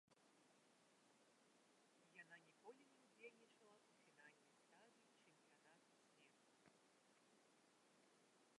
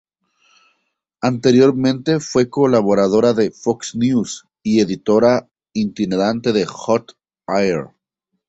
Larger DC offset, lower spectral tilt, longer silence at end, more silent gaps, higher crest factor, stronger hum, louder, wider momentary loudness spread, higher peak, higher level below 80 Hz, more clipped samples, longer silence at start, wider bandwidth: neither; second, -3 dB/octave vs -6 dB/octave; second, 0 s vs 0.6 s; neither; first, 22 dB vs 16 dB; neither; second, -67 LUFS vs -17 LUFS; second, 3 LU vs 9 LU; second, -50 dBFS vs -2 dBFS; second, under -90 dBFS vs -54 dBFS; neither; second, 0.05 s vs 1.25 s; first, 11 kHz vs 8.2 kHz